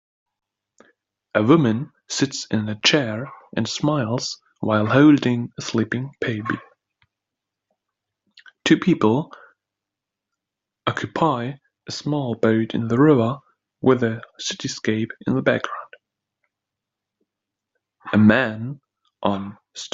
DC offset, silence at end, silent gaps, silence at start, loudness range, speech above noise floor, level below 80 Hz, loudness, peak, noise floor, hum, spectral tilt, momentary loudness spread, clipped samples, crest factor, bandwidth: under 0.1%; 0.05 s; none; 1.35 s; 7 LU; 65 dB; -60 dBFS; -21 LUFS; -2 dBFS; -85 dBFS; none; -5.5 dB/octave; 15 LU; under 0.1%; 20 dB; 7.8 kHz